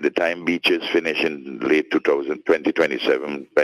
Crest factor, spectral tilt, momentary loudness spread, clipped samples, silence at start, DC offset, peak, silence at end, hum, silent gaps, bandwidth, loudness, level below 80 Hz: 16 dB; -4.5 dB/octave; 4 LU; under 0.1%; 0 s; under 0.1%; -4 dBFS; 0 s; none; none; 13 kHz; -21 LUFS; -64 dBFS